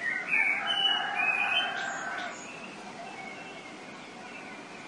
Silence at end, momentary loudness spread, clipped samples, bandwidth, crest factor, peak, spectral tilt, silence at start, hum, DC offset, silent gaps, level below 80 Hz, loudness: 0 s; 18 LU; under 0.1%; 11.5 kHz; 18 dB; -14 dBFS; -1 dB/octave; 0 s; none; under 0.1%; none; -78 dBFS; -27 LUFS